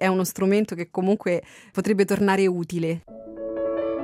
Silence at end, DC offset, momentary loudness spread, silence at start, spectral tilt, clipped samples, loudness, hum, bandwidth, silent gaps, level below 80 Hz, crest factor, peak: 0 s; under 0.1%; 12 LU; 0 s; -6 dB/octave; under 0.1%; -24 LUFS; none; 16 kHz; none; -60 dBFS; 14 dB; -8 dBFS